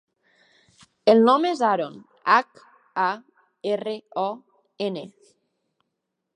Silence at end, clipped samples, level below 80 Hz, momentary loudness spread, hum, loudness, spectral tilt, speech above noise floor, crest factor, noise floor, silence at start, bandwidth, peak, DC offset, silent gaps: 1.3 s; under 0.1%; -82 dBFS; 19 LU; none; -23 LUFS; -5.5 dB/octave; 58 dB; 22 dB; -80 dBFS; 1.05 s; 10 kHz; -4 dBFS; under 0.1%; none